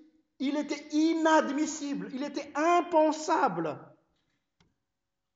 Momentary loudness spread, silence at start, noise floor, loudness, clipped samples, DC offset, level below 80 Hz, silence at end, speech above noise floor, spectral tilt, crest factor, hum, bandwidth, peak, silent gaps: 11 LU; 0.4 s; -87 dBFS; -28 LUFS; under 0.1%; under 0.1%; -80 dBFS; 1.5 s; 59 dB; -4 dB/octave; 18 dB; none; 8 kHz; -12 dBFS; none